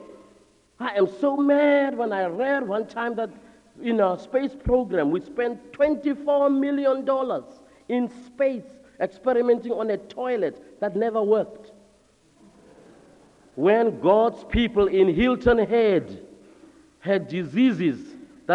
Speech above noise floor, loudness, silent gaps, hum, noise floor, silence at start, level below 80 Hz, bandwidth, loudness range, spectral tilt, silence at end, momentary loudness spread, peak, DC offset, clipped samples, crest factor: 37 dB; -23 LUFS; none; none; -59 dBFS; 0 s; -46 dBFS; 9.6 kHz; 5 LU; -7.5 dB/octave; 0 s; 11 LU; -6 dBFS; under 0.1%; under 0.1%; 18 dB